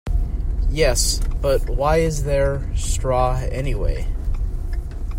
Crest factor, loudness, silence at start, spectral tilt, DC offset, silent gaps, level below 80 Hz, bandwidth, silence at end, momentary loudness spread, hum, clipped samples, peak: 16 dB; -22 LUFS; 0.05 s; -4.5 dB/octave; under 0.1%; none; -22 dBFS; 16 kHz; 0 s; 9 LU; none; under 0.1%; -4 dBFS